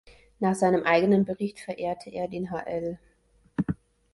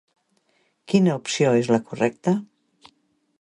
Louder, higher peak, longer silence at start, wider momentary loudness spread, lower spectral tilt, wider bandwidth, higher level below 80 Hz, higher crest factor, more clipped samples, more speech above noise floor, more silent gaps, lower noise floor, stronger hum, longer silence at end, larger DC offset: second, -27 LUFS vs -22 LUFS; about the same, -8 dBFS vs -6 dBFS; second, 0.4 s vs 0.9 s; first, 14 LU vs 5 LU; about the same, -6.5 dB/octave vs -6 dB/octave; about the same, 11.5 kHz vs 11 kHz; first, -56 dBFS vs -66 dBFS; about the same, 20 dB vs 18 dB; neither; second, 38 dB vs 46 dB; neither; second, -63 dBFS vs -67 dBFS; neither; second, 0.4 s vs 1 s; neither